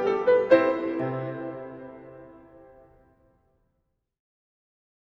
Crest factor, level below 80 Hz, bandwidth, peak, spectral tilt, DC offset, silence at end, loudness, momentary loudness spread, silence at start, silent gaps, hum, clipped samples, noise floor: 22 dB; -66 dBFS; 6 kHz; -6 dBFS; -8 dB/octave; under 0.1%; 2.75 s; -24 LUFS; 25 LU; 0 s; none; none; under 0.1%; -76 dBFS